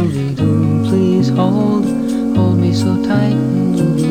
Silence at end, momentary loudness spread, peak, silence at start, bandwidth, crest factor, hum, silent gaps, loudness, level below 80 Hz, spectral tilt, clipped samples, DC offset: 0 s; 3 LU; 0 dBFS; 0 s; 14.5 kHz; 12 dB; none; none; -14 LUFS; -44 dBFS; -8 dB/octave; under 0.1%; 0.6%